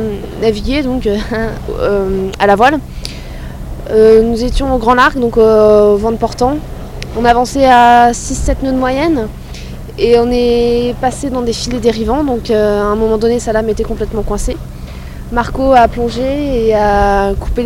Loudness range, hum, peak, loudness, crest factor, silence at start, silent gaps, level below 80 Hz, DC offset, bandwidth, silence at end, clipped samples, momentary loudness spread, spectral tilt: 5 LU; none; 0 dBFS; -12 LUFS; 12 dB; 0 s; none; -24 dBFS; under 0.1%; 16 kHz; 0 s; 0.8%; 18 LU; -5.5 dB/octave